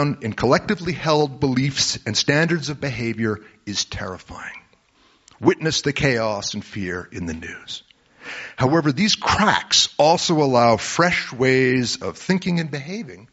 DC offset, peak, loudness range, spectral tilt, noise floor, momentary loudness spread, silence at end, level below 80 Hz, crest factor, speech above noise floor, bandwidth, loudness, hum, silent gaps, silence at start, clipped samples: under 0.1%; -2 dBFS; 7 LU; -3.5 dB/octave; -58 dBFS; 16 LU; 0.1 s; -48 dBFS; 18 dB; 38 dB; 8 kHz; -20 LUFS; none; none; 0 s; under 0.1%